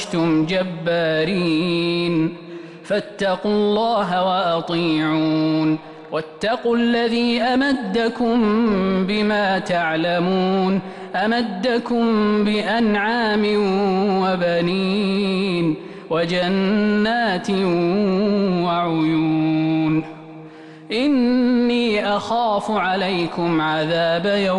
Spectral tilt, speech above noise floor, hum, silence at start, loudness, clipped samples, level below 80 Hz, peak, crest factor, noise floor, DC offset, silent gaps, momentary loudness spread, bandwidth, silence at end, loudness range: -6.5 dB/octave; 20 dB; none; 0 s; -19 LUFS; under 0.1%; -52 dBFS; -10 dBFS; 8 dB; -39 dBFS; under 0.1%; none; 5 LU; 11 kHz; 0 s; 2 LU